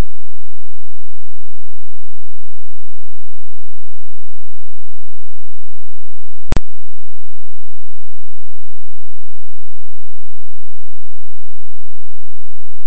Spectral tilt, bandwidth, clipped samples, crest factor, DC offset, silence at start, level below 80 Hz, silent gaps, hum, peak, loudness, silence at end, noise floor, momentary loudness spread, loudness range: -7.5 dB/octave; 8.2 kHz; under 0.1%; 26 dB; 90%; 6.45 s; -36 dBFS; none; none; 0 dBFS; -25 LUFS; 6.25 s; -52 dBFS; 0 LU; 23 LU